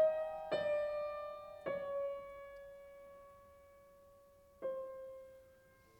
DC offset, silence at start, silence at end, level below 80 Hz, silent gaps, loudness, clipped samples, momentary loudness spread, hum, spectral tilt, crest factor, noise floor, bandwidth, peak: under 0.1%; 0 s; 0.45 s; -72 dBFS; none; -42 LUFS; under 0.1%; 25 LU; none; -5 dB/octave; 18 dB; -66 dBFS; 18 kHz; -24 dBFS